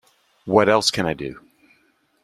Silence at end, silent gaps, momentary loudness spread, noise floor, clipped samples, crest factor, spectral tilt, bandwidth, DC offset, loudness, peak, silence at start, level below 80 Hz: 0.85 s; none; 17 LU; -63 dBFS; under 0.1%; 20 dB; -4 dB/octave; 15 kHz; under 0.1%; -19 LUFS; -2 dBFS; 0.45 s; -54 dBFS